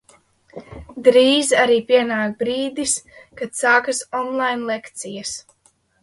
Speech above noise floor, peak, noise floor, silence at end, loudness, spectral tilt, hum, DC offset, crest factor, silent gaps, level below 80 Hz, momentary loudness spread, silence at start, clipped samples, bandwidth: 42 dB; 0 dBFS; -60 dBFS; 0.6 s; -18 LUFS; -2 dB/octave; none; under 0.1%; 20 dB; none; -54 dBFS; 17 LU; 0.55 s; under 0.1%; 11.5 kHz